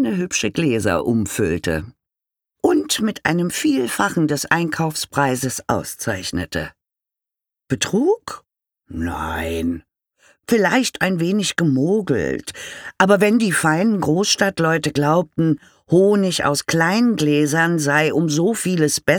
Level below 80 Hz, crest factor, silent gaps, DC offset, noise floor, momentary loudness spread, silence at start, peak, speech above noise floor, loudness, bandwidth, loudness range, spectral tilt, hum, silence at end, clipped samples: -46 dBFS; 18 dB; none; under 0.1%; -87 dBFS; 10 LU; 0 s; -2 dBFS; 68 dB; -19 LUFS; 20 kHz; 7 LU; -4.5 dB/octave; none; 0 s; under 0.1%